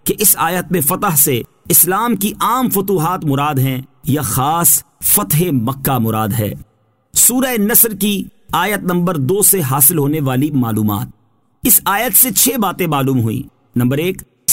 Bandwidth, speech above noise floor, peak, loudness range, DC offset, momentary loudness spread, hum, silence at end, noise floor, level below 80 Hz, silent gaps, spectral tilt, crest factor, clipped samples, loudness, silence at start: 16.5 kHz; 29 dB; 0 dBFS; 2 LU; 0.3%; 10 LU; none; 0 s; -43 dBFS; -44 dBFS; none; -4 dB/octave; 14 dB; under 0.1%; -13 LUFS; 0.05 s